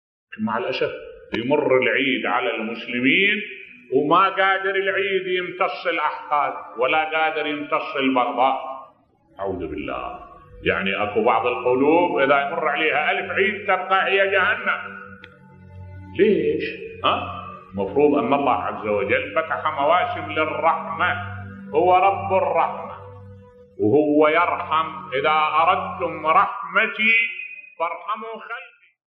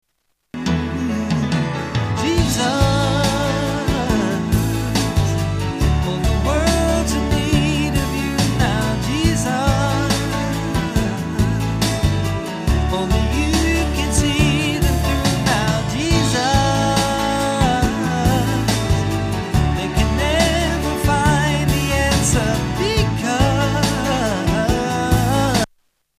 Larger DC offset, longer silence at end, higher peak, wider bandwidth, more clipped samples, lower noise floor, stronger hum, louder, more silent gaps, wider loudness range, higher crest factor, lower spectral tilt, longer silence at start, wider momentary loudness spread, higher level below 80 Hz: neither; about the same, 0.45 s vs 0.55 s; about the same, -4 dBFS vs -2 dBFS; second, 5.8 kHz vs 15.5 kHz; neither; second, -56 dBFS vs -70 dBFS; neither; about the same, -20 LUFS vs -18 LUFS; neither; about the same, 4 LU vs 2 LU; about the same, 18 dB vs 16 dB; first, -7.5 dB/octave vs -5 dB/octave; second, 0.3 s vs 0.55 s; first, 14 LU vs 5 LU; second, -58 dBFS vs -26 dBFS